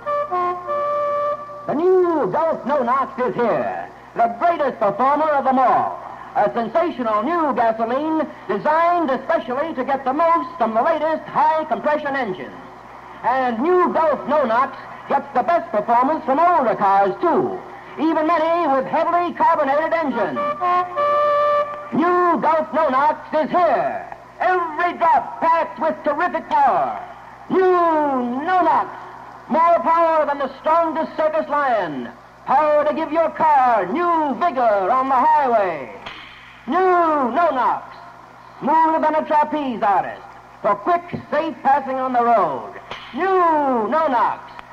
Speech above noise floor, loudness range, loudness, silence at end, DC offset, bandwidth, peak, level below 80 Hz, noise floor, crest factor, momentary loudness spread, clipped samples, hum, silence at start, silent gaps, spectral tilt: 24 dB; 2 LU; -19 LUFS; 0 s; under 0.1%; 7.8 kHz; -8 dBFS; -58 dBFS; -42 dBFS; 12 dB; 10 LU; under 0.1%; none; 0 s; none; -6.5 dB/octave